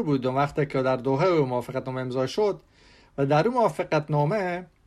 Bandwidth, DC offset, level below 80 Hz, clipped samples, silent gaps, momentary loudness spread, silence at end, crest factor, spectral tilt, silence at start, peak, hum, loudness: 12.5 kHz; under 0.1%; -58 dBFS; under 0.1%; none; 8 LU; 0.2 s; 16 dB; -7.5 dB/octave; 0 s; -8 dBFS; none; -25 LUFS